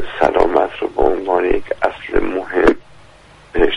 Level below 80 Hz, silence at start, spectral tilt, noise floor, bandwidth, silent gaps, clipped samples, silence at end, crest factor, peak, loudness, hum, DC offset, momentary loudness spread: -30 dBFS; 0 s; -6 dB/octave; -44 dBFS; 10.5 kHz; none; under 0.1%; 0 s; 16 dB; 0 dBFS; -17 LUFS; none; under 0.1%; 6 LU